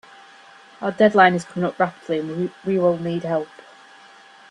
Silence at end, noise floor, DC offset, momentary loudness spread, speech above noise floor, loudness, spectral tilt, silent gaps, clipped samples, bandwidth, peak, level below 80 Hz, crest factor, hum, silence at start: 1.05 s; -47 dBFS; under 0.1%; 12 LU; 27 dB; -20 LUFS; -6.5 dB/octave; none; under 0.1%; 11 kHz; -2 dBFS; -66 dBFS; 20 dB; none; 0.8 s